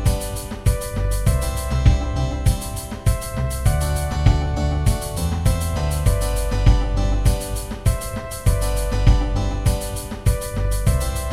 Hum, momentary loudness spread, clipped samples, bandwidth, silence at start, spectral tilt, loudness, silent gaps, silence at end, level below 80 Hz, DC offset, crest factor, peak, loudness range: none; 6 LU; under 0.1%; 16 kHz; 0 s; -5.5 dB/octave; -22 LUFS; none; 0 s; -22 dBFS; 0.9%; 18 dB; -2 dBFS; 1 LU